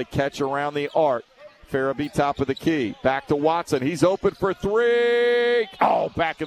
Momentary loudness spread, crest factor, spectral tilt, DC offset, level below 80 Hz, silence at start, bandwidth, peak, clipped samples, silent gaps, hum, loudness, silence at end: 6 LU; 18 dB; -5.5 dB/octave; under 0.1%; -50 dBFS; 0 s; 13.5 kHz; -4 dBFS; under 0.1%; none; none; -22 LUFS; 0 s